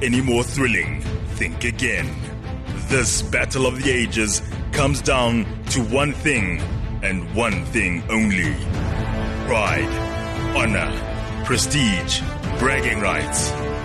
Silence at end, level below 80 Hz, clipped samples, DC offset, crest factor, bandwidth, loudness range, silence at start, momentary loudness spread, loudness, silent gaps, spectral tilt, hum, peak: 0 s; -30 dBFS; under 0.1%; under 0.1%; 14 dB; 13 kHz; 2 LU; 0 s; 7 LU; -21 LUFS; none; -4 dB/octave; none; -6 dBFS